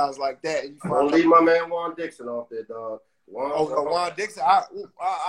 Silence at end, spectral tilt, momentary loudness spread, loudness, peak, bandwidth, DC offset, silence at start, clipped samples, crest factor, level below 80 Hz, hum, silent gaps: 0 s; -5 dB/octave; 18 LU; -23 LUFS; -4 dBFS; 11 kHz; under 0.1%; 0 s; under 0.1%; 18 dB; -64 dBFS; none; none